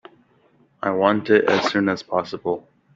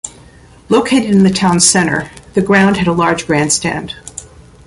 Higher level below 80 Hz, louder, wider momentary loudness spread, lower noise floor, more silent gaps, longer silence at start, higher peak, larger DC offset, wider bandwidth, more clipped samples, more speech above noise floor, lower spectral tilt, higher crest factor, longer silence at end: second, -64 dBFS vs -42 dBFS; second, -21 LUFS vs -12 LUFS; second, 11 LU vs 17 LU; first, -59 dBFS vs -41 dBFS; neither; first, 0.8 s vs 0.05 s; about the same, -2 dBFS vs 0 dBFS; neither; second, 7.6 kHz vs 11.5 kHz; neither; first, 39 dB vs 29 dB; first, -5.5 dB/octave vs -4 dB/octave; first, 20 dB vs 14 dB; about the same, 0.35 s vs 0.4 s